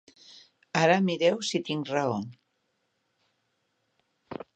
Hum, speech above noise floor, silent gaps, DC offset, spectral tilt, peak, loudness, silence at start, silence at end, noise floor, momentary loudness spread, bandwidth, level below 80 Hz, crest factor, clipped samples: none; 50 dB; none; under 0.1%; -5 dB/octave; -8 dBFS; -27 LUFS; 0.3 s; 0.2 s; -76 dBFS; 20 LU; 9.2 kHz; -74 dBFS; 22 dB; under 0.1%